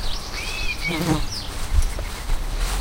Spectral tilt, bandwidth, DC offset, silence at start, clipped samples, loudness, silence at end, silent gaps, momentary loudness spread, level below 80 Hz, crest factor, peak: -4 dB/octave; 16 kHz; under 0.1%; 0 s; under 0.1%; -26 LUFS; 0 s; none; 7 LU; -24 dBFS; 16 dB; -6 dBFS